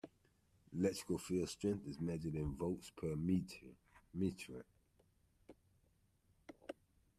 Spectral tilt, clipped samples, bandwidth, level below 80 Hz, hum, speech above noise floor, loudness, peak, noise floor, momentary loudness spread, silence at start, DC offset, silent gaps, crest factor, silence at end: -6.5 dB/octave; under 0.1%; 14 kHz; -64 dBFS; none; 35 dB; -42 LUFS; -24 dBFS; -76 dBFS; 17 LU; 0.05 s; under 0.1%; none; 20 dB; 0.45 s